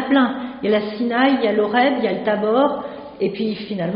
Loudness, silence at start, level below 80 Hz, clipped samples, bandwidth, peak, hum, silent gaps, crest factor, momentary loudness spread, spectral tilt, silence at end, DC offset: -19 LUFS; 0 s; -58 dBFS; under 0.1%; 5.4 kHz; -4 dBFS; none; none; 16 dB; 8 LU; -3.5 dB/octave; 0 s; under 0.1%